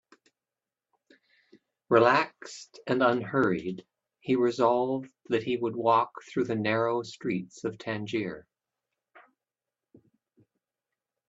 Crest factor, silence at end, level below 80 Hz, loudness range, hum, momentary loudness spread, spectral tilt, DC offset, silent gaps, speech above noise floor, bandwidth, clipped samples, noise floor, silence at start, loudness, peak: 22 dB; 2.9 s; -72 dBFS; 11 LU; none; 14 LU; -6 dB/octave; under 0.1%; none; over 63 dB; 8 kHz; under 0.1%; under -90 dBFS; 1.9 s; -28 LUFS; -8 dBFS